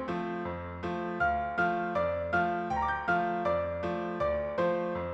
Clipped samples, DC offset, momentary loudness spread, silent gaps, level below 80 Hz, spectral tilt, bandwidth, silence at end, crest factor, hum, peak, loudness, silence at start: under 0.1%; under 0.1%; 6 LU; none; -52 dBFS; -7.5 dB/octave; 8 kHz; 0 s; 14 dB; none; -18 dBFS; -31 LUFS; 0 s